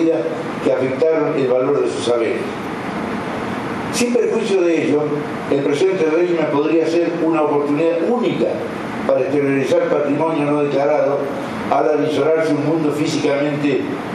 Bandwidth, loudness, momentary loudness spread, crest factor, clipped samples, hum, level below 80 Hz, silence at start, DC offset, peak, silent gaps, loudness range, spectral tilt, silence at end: 12.5 kHz; -18 LUFS; 7 LU; 16 dB; under 0.1%; none; -56 dBFS; 0 s; under 0.1%; -2 dBFS; none; 2 LU; -6 dB/octave; 0 s